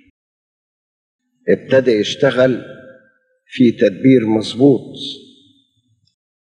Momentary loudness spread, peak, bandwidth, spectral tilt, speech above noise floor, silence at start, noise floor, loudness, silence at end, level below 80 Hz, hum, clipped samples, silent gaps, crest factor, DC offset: 15 LU; 0 dBFS; 9.8 kHz; -6.5 dB/octave; 48 dB; 1.45 s; -62 dBFS; -15 LUFS; 1.45 s; -62 dBFS; none; under 0.1%; none; 16 dB; under 0.1%